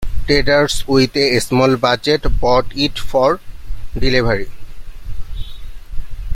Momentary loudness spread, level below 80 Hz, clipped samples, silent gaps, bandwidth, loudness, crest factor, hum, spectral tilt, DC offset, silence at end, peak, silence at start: 21 LU; -26 dBFS; under 0.1%; none; 15 kHz; -15 LUFS; 14 dB; none; -5 dB/octave; under 0.1%; 0 s; 0 dBFS; 0 s